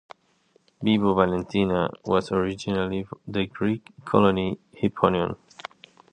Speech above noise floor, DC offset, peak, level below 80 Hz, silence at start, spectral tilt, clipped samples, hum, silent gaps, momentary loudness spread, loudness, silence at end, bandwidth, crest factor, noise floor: 40 dB; under 0.1%; -2 dBFS; -50 dBFS; 0.8 s; -7 dB/octave; under 0.1%; none; none; 11 LU; -25 LUFS; 0.75 s; 9.4 kHz; 22 dB; -64 dBFS